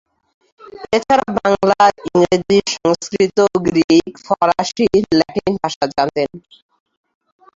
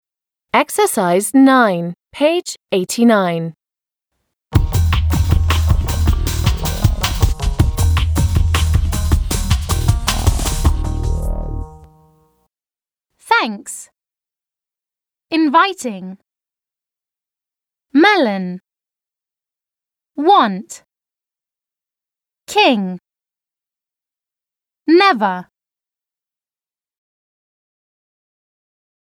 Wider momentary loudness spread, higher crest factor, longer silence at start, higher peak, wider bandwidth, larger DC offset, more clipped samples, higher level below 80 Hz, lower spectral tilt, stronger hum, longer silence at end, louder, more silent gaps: second, 6 LU vs 16 LU; about the same, 16 dB vs 18 dB; about the same, 0.65 s vs 0.55 s; about the same, -2 dBFS vs 0 dBFS; second, 7.8 kHz vs over 20 kHz; neither; neither; second, -48 dBFS vs -24 dBFS; about the same, -5 dB/octave vs -5.5 dB/octave; neither; second, 1.15 s vs 3.6 s; about the same, -16 LUFS vs -16 LUFS; first, 3.84-3.88 s, 5.76-5.81 s vs none